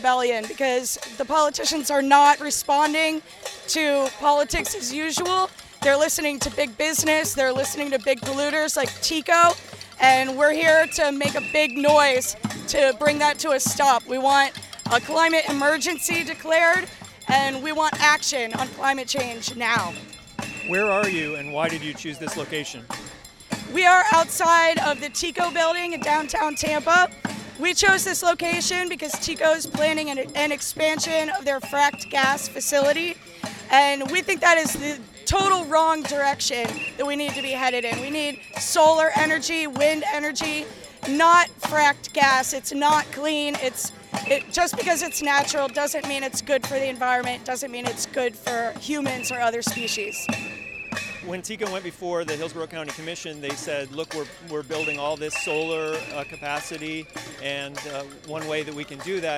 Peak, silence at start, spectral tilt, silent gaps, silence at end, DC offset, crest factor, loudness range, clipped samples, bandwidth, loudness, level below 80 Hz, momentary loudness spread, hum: -2 dBFS; 0 s; -2 dB/octave; none; 0 s; under 0.1%; 20 dB; 8 LU; under 0.1%; 17.5 kHz; -22 LUFS; -52 dBFS; 14 LU; none